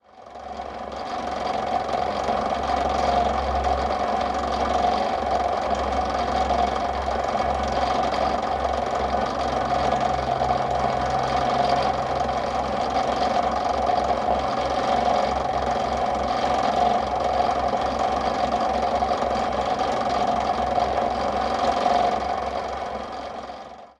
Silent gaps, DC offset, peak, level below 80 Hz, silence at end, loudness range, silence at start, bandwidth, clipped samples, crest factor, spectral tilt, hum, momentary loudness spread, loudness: none; under 0.1%; -8 dBFS; -38 dBFS; 0.1 s; 1 LU; 0.15 s; 11 kHz; under 0.1%; 16 dB; -5 dB/octave; none; 6 LU; -24 LUFS